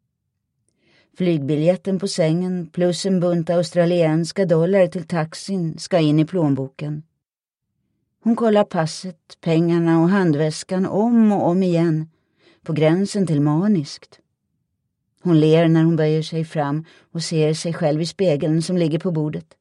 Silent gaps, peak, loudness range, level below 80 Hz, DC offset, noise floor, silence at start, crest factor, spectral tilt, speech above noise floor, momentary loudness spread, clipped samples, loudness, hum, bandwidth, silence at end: none; -4 dBFS; 4 LU; -66 dBFS; under 0.1%; -84 dBFS; 1.2 s; 16 dB; -7 dB/octave; 65 dB; 11 LU; under 0.1%; -19 LUFS; none; 11 kHz; 0.2 s